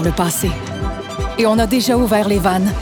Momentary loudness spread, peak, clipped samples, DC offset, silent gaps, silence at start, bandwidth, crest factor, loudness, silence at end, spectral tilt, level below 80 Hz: 10 LU; -2 dBFS; under 0.1%; under 0.1%; none; 0 s; over 20 kHz; 14 dB; -17 LUFS; 0 s; -5 dB/octave; -28 dBFS